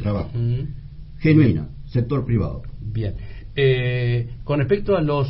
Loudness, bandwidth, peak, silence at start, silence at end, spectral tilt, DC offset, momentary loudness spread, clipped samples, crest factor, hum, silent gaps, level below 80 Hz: -21 LUFS; 5.8 kHz; -2 dBFS; 0 s; 0 s; -12.5 dB/octave; under 0.1%; 14 LU; under 0.1%; 18 dB; none; none; -36 dBFS